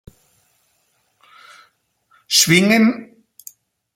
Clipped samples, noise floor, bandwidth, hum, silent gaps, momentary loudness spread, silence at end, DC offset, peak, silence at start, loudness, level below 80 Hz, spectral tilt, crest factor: under 0.1%; -65 dBFS; 16.5 kHz; none; none; 8 LU; 0.9 s; under 0.1%; 0 dBFS; 2.3 s; -14 LUFS; -58 dBFS; -3 dB/octave; 22 dB